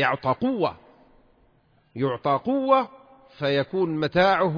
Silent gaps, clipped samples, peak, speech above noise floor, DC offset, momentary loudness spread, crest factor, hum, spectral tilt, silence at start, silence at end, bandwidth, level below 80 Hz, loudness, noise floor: none; under 0.1%; -6 dBFS; 39 dB; under 0.1%; 9 LU; 18 dB; none; -7.5 dB/octave; 0 s; 0 s; 5.2 kHz; -58 dBFS; -24 LUFS; -62 dBFS